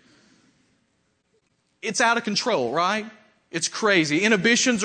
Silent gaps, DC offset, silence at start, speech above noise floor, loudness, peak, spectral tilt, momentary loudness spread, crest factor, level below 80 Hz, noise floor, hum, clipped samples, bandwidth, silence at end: none; under 0.1%; 1.85 s; 48 dB; -21 LUFS; -6 dBFS; -2.5 dB/octave; 11 LU; 18 dB; -70 dBFS; -70 dBFS; none; under 0.1%; 9.4 kHz; 0 s